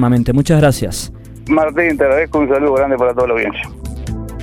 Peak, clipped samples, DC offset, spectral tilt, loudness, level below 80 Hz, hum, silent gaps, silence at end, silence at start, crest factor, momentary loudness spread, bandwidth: 0 dBFS; under 0.1%; under 0.1%; -6.5 dB/octave; -14 LUFS; -30 dBFS; none; none; 0 s; 0 s; 14 dB; 13 LU; 17 kHz